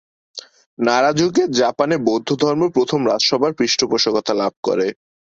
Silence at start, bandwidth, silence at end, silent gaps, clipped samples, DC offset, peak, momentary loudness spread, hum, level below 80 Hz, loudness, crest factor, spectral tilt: 0.35 s; 7.8 kHz; 0.3 s; 0.66-0.77 s, 4.57-4.63 s; under 0.1%; under 0.1%; -2 dBFS; 7 LU; none; -60 dBFS; -17 LUFS; 16 dB; -4 dB/octave